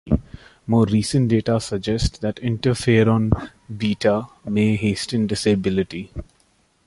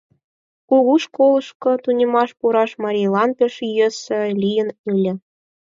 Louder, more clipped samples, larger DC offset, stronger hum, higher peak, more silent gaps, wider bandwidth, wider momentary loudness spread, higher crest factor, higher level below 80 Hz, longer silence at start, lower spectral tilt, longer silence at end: second, -21 LUFS vs -18 LUFS; neither; neither; neither; about the same, -2 dBFS vs -4 dBFS; second, none vs 1.55-1.60 s, 4.79-4.84 s; first, 11.5 kHz vs 7.6 kHz; first, 9 LU vs 6 LU; about the same, 18 dB vs 14 dB; first, -36 dBFS vs -70 dBFS; second, 0.05 s vs 0.7 s; about the same, -6.5 dB/octave vs -6 dB/octave; about the same, 0.65 s vs 0.55 s